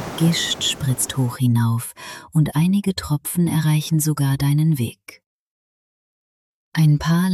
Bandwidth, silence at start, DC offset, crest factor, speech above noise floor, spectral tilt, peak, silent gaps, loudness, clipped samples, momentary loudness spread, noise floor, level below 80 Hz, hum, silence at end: 14.5 kHz; 0 s; under 0.1%; 14 dB; over 71 dB; -5 dB/octave; -6 dBFS; 5.26-6.72 s; -20 LUFS; under 0.1%; 6 LU; under -90 dBFS; -50 dBFS; none; 0 s